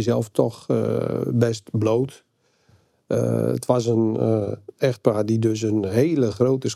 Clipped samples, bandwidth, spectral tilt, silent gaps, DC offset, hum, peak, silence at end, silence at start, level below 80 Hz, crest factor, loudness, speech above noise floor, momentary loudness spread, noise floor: under 0.1%; 14 kHz; -7 dB/octave; none; under 0.1%; none; -4 dBFS; 0 s; 0 s; -62 dBFS; 18 dB; -22 LUFS; 39 dB; 4 LU; -60 dBFS